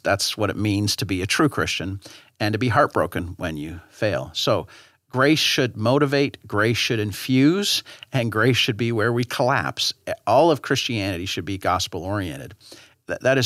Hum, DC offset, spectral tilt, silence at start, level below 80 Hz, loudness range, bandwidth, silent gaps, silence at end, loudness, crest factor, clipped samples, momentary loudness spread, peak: none; under 0.1%; -4.5 dB/octave; 0.05 s; -58 dBFS; 3 LU; 16 kHz; none; 0 s; -22 LUFS; 18 dB; under 0.1%; 11 LU; -4 dBFS